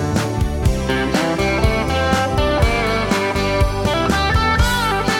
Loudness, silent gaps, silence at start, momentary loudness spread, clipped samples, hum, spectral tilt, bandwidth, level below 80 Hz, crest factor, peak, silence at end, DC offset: -17 LUFS; none; 0 s; 3 LU; under 0.1%; none; -5 dB/octave; 18 kHz; -24 dBFS; 14 dB; -2 dBFS; 0 s; under 0.1%